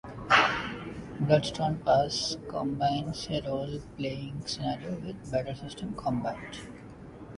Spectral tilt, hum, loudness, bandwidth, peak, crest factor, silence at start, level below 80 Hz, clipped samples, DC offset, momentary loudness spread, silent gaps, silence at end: -5 dB/octave; none; -30 LUFS; 11.5 kHz; -8 dBFS; 22 dB; 0.05 s; -52 dBFS; under 0.1%; under 0.1%; 16 LU; none; 0 s